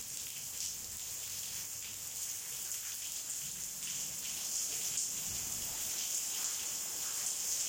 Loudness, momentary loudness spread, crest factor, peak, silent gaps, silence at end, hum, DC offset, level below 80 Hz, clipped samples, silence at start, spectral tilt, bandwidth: -37 LUFS; 6 LU; 20 dB; -20 dBFS; none; 0 s; none; under 0.1%; -68 dBFS; under 0.1%; 0 s; 1 dB/octave; 17 kHz